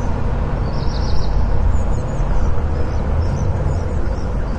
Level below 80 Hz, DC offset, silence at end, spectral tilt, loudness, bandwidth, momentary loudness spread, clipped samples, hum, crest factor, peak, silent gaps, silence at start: -20 dBFS; under 0.1%; 0 s; -7.5 dB/octave; -21 LUFS; 7.6 kHz; 2 LU; under 0.1%; none; 12 dB; -4 dBFS; none; 0 s